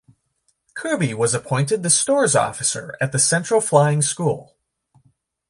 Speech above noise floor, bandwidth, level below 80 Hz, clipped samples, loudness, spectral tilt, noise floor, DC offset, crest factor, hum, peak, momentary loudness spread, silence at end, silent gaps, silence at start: 49 dB; 11.5 kHz; -60 dBFS; under 0.1%; -19 LUFS; -4 dB/octave; -68 dBFS; under 0.1%; 18 dB; none; -2 dBFS; 9 LU; 1.05 s; none; 0.75 s